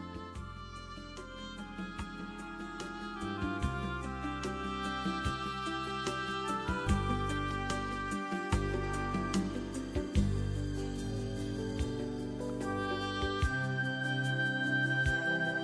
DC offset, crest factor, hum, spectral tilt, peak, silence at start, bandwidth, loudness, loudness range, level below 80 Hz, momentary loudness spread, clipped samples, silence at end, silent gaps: under 0.1%; 18 dB; none; -5.5 dB/octave; -18 dBFS; 0 s; 11 kHz; -35 LUFS; 6 LU; -44 dBFS; 12 LU; under 0.1%; 0 s; none